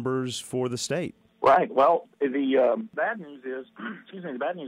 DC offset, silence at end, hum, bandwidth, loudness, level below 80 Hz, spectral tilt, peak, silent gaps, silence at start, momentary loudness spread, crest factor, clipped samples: under 0.1%; 0 s; none; 15.5 kHz; -25 LUFS; -68 dBFS; -5 dB/octave; -10 dBFS; none; 0 s; 16 LU; 16 dB; under 0.1%